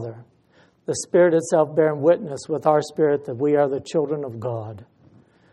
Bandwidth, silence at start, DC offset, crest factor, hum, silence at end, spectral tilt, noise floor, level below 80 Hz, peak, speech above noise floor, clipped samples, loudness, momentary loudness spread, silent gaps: 11.5 kHz; 0 s; under 0.1%; 18 dB; none; 0.7 s; -6 dB/octave; -58 dBFS; -66 dBFS; -4 dBFS; 37 dB; under 0.1%; -21 LUFS; 12 LU; none